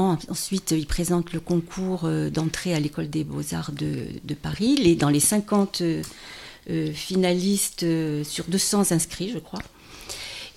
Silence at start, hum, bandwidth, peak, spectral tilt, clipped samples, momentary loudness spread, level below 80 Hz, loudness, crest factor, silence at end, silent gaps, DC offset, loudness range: 0 s; none; 16.5 kHz; -6 dBFS; -4.5 dB/octave; under 0.1%; 14 LU; -44 dBFS; -24 LUFS; 20 dB; 0.05 s; none; under 0.1%; 4 LU